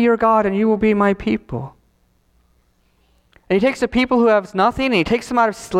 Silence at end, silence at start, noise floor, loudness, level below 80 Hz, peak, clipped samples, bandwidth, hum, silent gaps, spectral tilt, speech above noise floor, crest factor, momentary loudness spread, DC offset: 0 s; 0 s; -60 dBFS; -17 LUFS; -44 dBFS; -2 dBFS; under 0.1%; 13.5 kHz; none; none; -6 dB/octave; 43 dB; 16 dB; 8 LU; under 0.1%